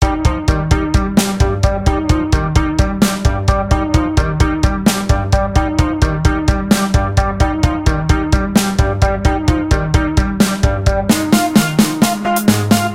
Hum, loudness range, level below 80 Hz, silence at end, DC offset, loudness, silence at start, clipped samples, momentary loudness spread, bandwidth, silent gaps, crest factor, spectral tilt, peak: none; 1 LU; -18 dBFS; 0 s; under 0.1%; -15 LUFS; 0 s; under 0.1%; 3 LU; 16.5 kHz; none; 14 dB; -5.5 dB/octave; 0 dBFS